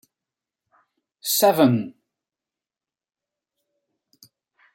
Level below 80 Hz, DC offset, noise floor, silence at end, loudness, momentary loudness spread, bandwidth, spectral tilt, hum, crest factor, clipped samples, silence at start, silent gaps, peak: -74 dBFS; under 0.1%; under -90 dBFS; 2.85 s; -19 LUFS; 16 LU; 16.5 kHz; -4.5 dB/octave; none; 22 dB; under 0.1%; 1.25 s; none; -4 dBFS